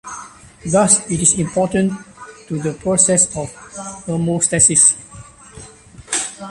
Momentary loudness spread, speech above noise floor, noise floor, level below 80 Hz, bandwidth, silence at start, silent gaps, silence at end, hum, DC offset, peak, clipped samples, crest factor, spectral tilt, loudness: 19 LU; 24 dB; -40 dBFS; -46 dBFS; 11.5 kHz; 0.05 s; none; 0 s; none; under 0.1%; 0 dBFS; under 0.1%; 18 dB; -3.5 dB/octave; -14 LUFS